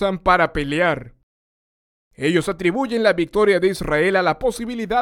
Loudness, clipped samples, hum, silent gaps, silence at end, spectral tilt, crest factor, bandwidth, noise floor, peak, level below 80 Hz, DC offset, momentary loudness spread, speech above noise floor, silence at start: -19 LUFS; under 0.1%; none; 1.23-2.11 s; 0 s; -5.5 dB/octave; 18 dB; 16.5 kHz; under -90 dBFS; -2 dBFS; -40 dBFS; under 0.1%; 6 LU; over 71 dB; 0 s